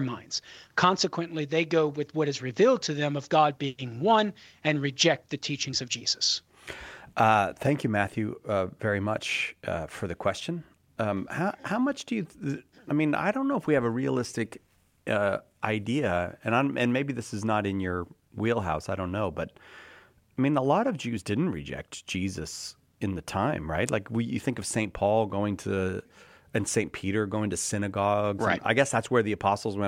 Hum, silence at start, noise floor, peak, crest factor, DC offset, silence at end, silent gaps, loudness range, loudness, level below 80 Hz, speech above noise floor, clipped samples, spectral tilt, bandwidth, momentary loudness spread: none; 0 s; -56 dBFS; -6 dBFS; 22 dB; under 0.1%; 0 s; none; 5 LU; -28 LUFS; -58 dBFS; 28 dB; under 0.1%; -4.5 dB/octave; 16 kHz; 11 LU